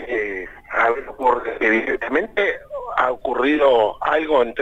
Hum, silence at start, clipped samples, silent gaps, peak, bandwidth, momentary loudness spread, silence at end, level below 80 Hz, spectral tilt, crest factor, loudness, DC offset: none; 0 s; under 0.1%; none; -4 dBFS; 8.2 kHz; 9 LU; 0 s; -48 dBFS; -5 dB/octave; 14 dB; -19 LUFS; under 0.1%